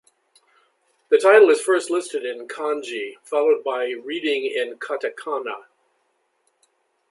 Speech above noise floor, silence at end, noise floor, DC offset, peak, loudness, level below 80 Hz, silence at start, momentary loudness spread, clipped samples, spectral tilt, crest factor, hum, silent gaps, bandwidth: 49 dB; 1.5 s; -69 dBFS; under 0.1%; -2 dBFS; -21 LUFS; -82 dBFS; 1.1 s; 15 LU; under 0.1%; -2 dB/octave; 20 dB; none; none; 11.5 kHz